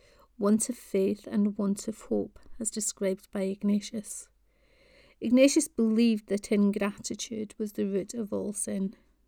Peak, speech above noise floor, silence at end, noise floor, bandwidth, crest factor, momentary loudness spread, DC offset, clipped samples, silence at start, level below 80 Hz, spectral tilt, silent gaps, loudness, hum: -8 dBFS; 36 dB; 0.35 s; -65 dBFS; 17.5 kHz; 20 dB; 11 LU; under 0.1%; under 0.1%; 0.4 s; -62 dBFS; -5 dB/octave; none; -29 LUFS; none